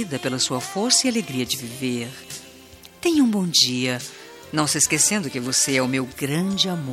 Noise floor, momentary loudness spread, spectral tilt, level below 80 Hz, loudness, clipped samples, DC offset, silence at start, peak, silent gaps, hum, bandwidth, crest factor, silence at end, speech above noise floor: -46 dBFS; 13 LU; -2.5 dB/octave; -60 dBFS; -21 LUFS; under 0.1%; under 0.1%; 0 s; -2 dBFS; none; none; 16.5 kHz; 20 dB; 0 s; 23 dB